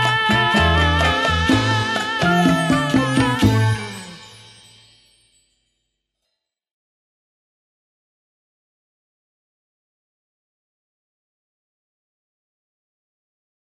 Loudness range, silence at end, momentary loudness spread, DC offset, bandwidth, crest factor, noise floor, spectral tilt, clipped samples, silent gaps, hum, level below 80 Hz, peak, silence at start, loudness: 9 LU; 9.5 s; 6 LU; under 0.1%; 14 kHz; 20 dB; -78 dBFS; -5 dB/octave; under 0.1%; none; none; -36 dBFS; -2 dBFS; 0 s; -17 LUFS